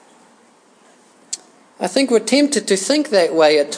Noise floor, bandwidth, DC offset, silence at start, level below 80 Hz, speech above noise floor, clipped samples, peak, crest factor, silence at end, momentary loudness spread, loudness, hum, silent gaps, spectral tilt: -52 dBFS; 10.5 kHz; under 0.1%; 1.35 s; -84 dBFS; 36 dB; under 0.1%; 0 dBFS; 18 dB; 0 s; 16 LU; -16 LUFS; none; none; -3 dB/octave